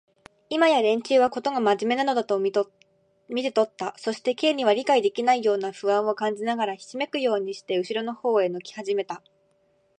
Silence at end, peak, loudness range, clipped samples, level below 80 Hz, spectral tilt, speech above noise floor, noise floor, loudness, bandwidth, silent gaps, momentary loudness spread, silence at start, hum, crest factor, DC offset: 0.85 s; -6 dBFS; 3 LU; under 0.1%; -76 dBFS; -4 dB/octave; 42 dB; -66 dBFS; -24 LUFS; 9.8 kHz; none; 9 LU; 0.5 s; none; 18 dB; under 0.1%